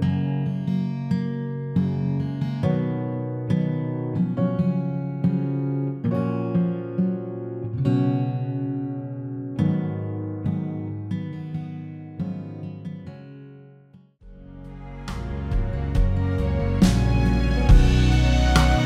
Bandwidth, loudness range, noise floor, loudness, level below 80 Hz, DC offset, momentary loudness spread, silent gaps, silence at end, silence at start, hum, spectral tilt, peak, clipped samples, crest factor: 12.5 kHz; 13 LU; -51 dBFS; -24 LUFS; -28 dBFS; under 0.1%; 16 LU; none; 0 s; 0 s; none; -7.5 dB/octave; -4 dBFS; under 0.1%; 20 dB